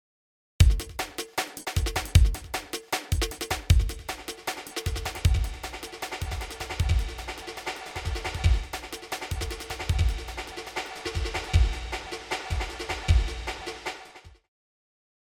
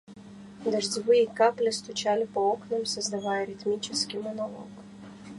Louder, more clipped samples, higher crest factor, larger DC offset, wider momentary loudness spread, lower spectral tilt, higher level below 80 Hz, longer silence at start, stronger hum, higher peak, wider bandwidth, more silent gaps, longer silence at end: about the same, -29 LUFS vs -28 LUFS; neither; about the same, 22 dB vs 18 dB; neither; second, 12 LU vs 22 LU; first, -4.5 dB/octave vs -3 dB/octave; first, -30 dBFS vs -70 dBFS; first, 0.6 s vs 0.1 s; second, none vs 50 Hz at -45 dBFS; first, -6 dBFS vs -10 dBFS; first, 19 kHz vs 11.5 kHz; neither; first, 1.05 s vs 0 s